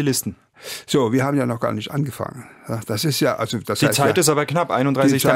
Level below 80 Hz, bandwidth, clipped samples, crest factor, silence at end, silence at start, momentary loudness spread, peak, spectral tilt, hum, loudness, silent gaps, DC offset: -58 dBFS; 16.5 kHz; under 0.1%; 20 dB; 0 s; 0 s; 15 LU; 0 dBFS; -4.5 dB/octave; none; -20 LUFS; none; under 0.1%